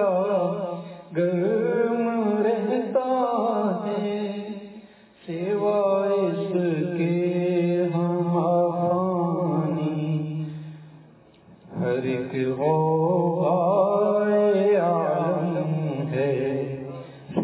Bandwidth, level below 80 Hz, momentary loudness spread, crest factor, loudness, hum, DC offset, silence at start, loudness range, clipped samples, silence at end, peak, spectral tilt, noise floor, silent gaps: 4 kHz; -68 dBFS; 11 LU; 16 dB; -24 LUFS; none; under 0.1%; 0 s; 5 LU; under 0.1%; 0 s; -8 dBFS; -12 dB/octave; -52 dBFS; none